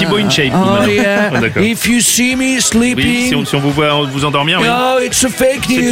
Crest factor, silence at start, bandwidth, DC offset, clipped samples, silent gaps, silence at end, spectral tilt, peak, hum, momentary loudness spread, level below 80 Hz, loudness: 12 dB; 0 s; 16 kHz; under 0.1%; under 0.1%; none; 0 s; -3.5 dB/octave; 0 dBFS; none; 3 LU; -38 dBFS; -11 LUFS